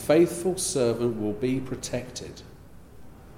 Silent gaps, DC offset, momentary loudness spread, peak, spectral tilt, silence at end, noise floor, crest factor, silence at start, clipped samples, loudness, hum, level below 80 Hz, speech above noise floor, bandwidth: none; under 0.1%; 17 LU; -10 dBFS; -5 dB/octave; 0 s; -46 dBFS; 18 dB; 0 s; under 0.1%; -26 LUFS; none; -52 dBFS; 20 dB; 16.5 kHz